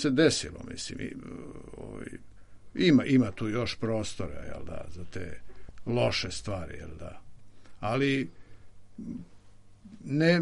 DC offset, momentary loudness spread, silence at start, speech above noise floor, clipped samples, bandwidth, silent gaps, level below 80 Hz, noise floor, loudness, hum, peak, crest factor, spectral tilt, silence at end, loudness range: under 0.1%; 21 LU; 0 s; 22 dB; under 0.1%; 11.5 kHz; none; -52 dBFS; -51 dBFS; -29 LUFS; none; -8 dBFS; 22 dB; -5.5 dB/octave; 0 s; 6 LU